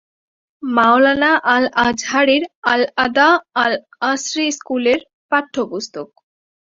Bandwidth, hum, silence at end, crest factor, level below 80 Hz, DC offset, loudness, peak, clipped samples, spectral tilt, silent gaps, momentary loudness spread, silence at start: 7.8 kHz; none; 0.65 s; 16 dB; -56 dBFS; under 0.1%; -16 LUFS; -2 dBFS; under 0.1%; -2.5 dB/octave; 2.55-2.62 s, 5.13-5.29 s; 11 LU; 0.6 s